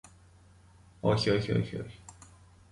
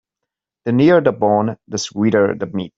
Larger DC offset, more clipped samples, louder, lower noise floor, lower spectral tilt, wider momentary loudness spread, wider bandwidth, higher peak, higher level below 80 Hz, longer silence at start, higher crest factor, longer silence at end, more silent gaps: neither; neither; second, -30 LUFS vs -16 LUFS; second, -58 dBFS vs -82 dBFS; about the same, -6.5 dB/octave vs -6 dB/octave; first, 22 LU vs 11 LU; first, 11.5 kHz vs 7.8 kHz; second, -12 dBFS vs 0 dBFS; about the same, -54 dBFS vs -56 dBFS; first, 1.05 s vs 0.65 s; about the same, 20 dB vs 16 dB; first, 0.6 s vs 0.1 s; neither